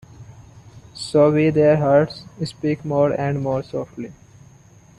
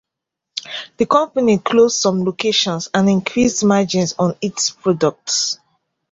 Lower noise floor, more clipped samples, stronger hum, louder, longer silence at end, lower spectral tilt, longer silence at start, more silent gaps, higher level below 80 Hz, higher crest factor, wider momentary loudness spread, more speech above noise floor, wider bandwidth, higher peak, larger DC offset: second, -49 dBFS vs -82 dBFS; neither; neither; about the same, -19 LUFS vs -17 LUFS; first, 0.85 s vs 0.55 s; first, -7.5 dB/octave vs -4 dB/octave; second, 0.2 s vs 0.55 s; neither; about the same, -54 dBFS vs -54 dBFS; about the same, 18 dB vs 16 dB; first, 17 LU vs 11 LU; second, 30 dB vs 65 dB; first, 11.5 kHz vs 8 kHz; about the same, -4 dBFS vs -2 dBFS; neither